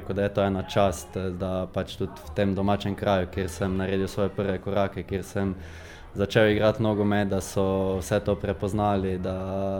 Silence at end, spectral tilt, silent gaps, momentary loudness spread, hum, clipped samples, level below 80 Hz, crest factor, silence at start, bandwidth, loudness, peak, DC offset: 0 s; -6.5 dB/octave; none; 9 LU; none; under 0.1%; -46 dBFS; 20 dB; 0 s; 18 kHz; -26 LUFS; -6 dBFS; under 0.1%